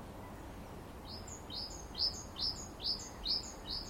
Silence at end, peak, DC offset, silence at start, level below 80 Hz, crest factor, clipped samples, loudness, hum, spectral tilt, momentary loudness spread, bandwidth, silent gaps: 0 s; -22 dBFS; under 0.1%; 0 s; -54 dBFS; 20 dB; under 0.1%; -38 LUFS; none; -2.5 dB/octave; 14 LU; 16 kHz; none